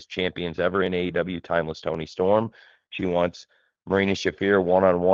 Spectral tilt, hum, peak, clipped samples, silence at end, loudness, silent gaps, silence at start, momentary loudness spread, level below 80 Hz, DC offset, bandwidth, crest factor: -6 dB/octave; none; -4 dBFS; under 0.1%; 0 s; -24 LUFS; none; 0 s; 10 LU; -56 dBFS; under 0.1%; 7.4 kHz; 20 dB